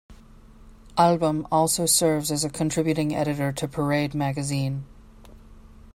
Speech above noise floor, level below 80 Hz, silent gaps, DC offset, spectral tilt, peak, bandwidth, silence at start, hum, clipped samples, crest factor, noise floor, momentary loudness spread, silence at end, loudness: 25 dB; -50 dBFS; none; under 0.1%; -4.5 dB/octave; -4 dBFS; 16 kHz; 0.1 s; none; under 0.1%; 20 dB; -48 dBFS; 8 LU; 0.05 s; -23 LUFS